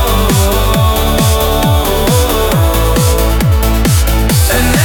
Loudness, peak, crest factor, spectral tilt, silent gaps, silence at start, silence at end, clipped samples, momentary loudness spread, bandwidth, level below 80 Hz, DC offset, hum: -11 LUFS; 0 dBFS; 10 dB; -4.5 dB/octave; none; 0 s; 0 s; under 0.1%; 1 LU; 19 kHz; -14 dBFS; under 0.1%; none